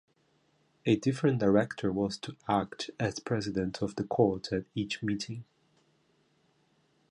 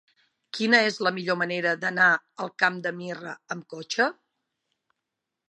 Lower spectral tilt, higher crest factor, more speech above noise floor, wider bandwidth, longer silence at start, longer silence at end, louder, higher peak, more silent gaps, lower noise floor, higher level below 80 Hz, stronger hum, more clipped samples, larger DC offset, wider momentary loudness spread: first, -6 dB/octave vs -4 dB/octave; about the same, 20 dB vs 22 dB; second, 40 dB vs 59 dB; about the same, 11 kHz vs 10 kHz; first, 0.85 s vs 0.55 s; first, 1.7 s vs 1.4 s; second, -31 LUFS vs -24 LUFS; second, -12 dBFS vs -4 dBFS; neither; second, -70 dBFS vs -85 dBFS; first, -60 dBFS vs -82 dBFS; neither; neither; neither; second, 9 LU vs 16 LU